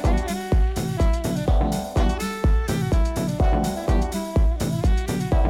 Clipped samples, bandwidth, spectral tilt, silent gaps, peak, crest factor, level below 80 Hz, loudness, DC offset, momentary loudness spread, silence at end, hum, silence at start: under 0.1%; 16 kHz; -6.5 dB/octave; none; -8 dBFS; 12 dB; -22 dBFS; -23 LUFS; under 0.1%; 2 LU; 0 s; none; 0 s